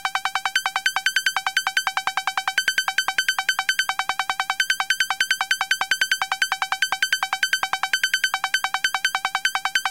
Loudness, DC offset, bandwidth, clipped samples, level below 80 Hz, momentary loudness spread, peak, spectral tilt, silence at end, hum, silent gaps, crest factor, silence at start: -22 LUFS; 0.2%; 17 kHz; under 0.1%; -66 dBFS; 3 LU; -6 dBFS; 3 dB/octave; 0 s; none; none; 16 dB; 0 s